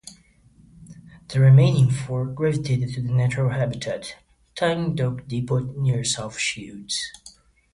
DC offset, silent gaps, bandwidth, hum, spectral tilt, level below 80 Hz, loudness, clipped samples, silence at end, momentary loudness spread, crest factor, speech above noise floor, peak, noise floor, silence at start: under 0.1%; none; 11.5 kHz; none; -5.5 dB/octave; -52 dBFS; -22 LUFS; under 0.1%; 0.45 s; 14 LU; 16 dB; 33 dB; -6 dBFS; -55 dBFS; 0.05 s